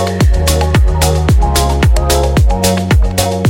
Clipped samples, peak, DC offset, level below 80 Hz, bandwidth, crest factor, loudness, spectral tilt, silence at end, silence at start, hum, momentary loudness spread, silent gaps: under 0.1%; 0 dBFS; under 0.1%; -14 dBFS; 17 kHz; 10 dB; -12 LUFS; -5 dB/octave; 0 s; 0 s; none; 1 LU; none